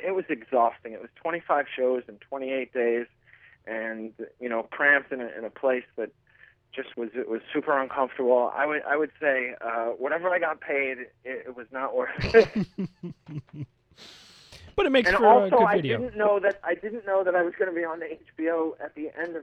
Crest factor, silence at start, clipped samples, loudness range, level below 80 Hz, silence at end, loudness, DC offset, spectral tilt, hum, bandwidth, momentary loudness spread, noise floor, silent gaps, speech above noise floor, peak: 22 dB; 0 s; under 0.1%; 6 LU; -56 dBFS; 0 s; -26 LUFS; under 0.1%; -6.5 dB/octave; none; 9.4 kHz; 17 LU; -58 dBFS; none; 32 dB; -4 dBFS